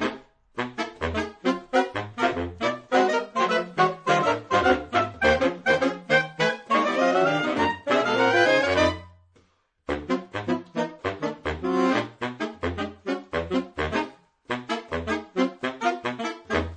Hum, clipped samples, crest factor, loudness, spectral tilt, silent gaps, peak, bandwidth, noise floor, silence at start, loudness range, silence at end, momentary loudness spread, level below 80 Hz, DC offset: none; under 0.1%; 20 dB; -25 LUFS; -5 dB/octave; none; -6 dBFS; 10 kHz; -64 dBFS; 0 s; 6 LU; 0 s; 10 LU; -48 dBFS; under 0.1%